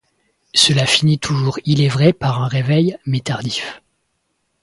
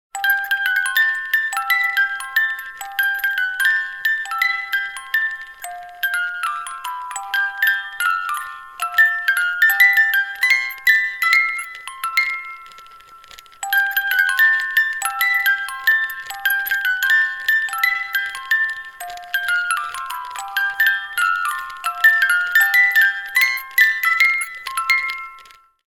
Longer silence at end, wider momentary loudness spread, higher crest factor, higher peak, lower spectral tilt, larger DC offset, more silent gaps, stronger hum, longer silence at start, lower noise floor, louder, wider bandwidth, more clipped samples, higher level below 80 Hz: first, 0.85 s vs 0.45 s; second, 9 LU vs 13 LU; about the same, 16 dB vs 18 dB; about the same, 0 dBFS vs -2 dBFS; first, -4.5 dB/octave vs 3.5 dB/octave; neither; neither; neither; first, 0.55 s vs 0.15 s; first, -69 dBFS vs -46 dBFS; about the same, -16 LUFS vs -17 LUFS; second, 11.5 kHz vs 18 kHz; neither; first, -50 dBFS vs -62 dBFS